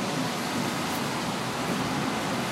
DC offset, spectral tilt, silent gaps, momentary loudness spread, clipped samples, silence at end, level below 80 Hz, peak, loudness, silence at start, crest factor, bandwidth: under 0.1%; -4 dB/octave; none; 1 LU; under 0.1%; 0 s; -58 dBFS; -16 dBFS; -29 LUFS; 0 s; 12 dB; 16 kHz